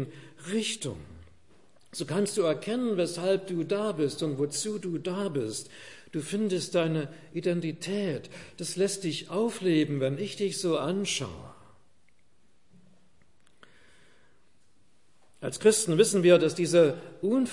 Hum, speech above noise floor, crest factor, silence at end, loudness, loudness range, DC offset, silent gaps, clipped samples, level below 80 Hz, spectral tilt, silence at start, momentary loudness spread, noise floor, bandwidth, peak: none; 42 dB; 22 dB; 0 s; -28 LUFS; 8 LU; 0.2%; none; under 0.1%; -70 dBFS; -4.5 dB/octave; 0 s; 15 LU; -70 dBFS; 11.5 kHz; -8 dBFS